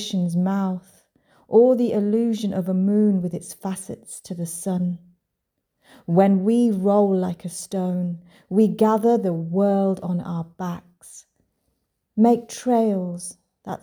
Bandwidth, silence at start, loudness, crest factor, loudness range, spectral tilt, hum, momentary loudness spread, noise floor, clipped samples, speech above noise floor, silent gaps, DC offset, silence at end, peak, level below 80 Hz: 19.5 kHz; 0 s; -21 LUFS; 18 dB; 4 LU; -7 dB/octave; none; 16 LU; -78 dBFS; under 0.1%; 58 dB; none; under 0.1%; 0.05 s; -4 dBFS; -66 dBFS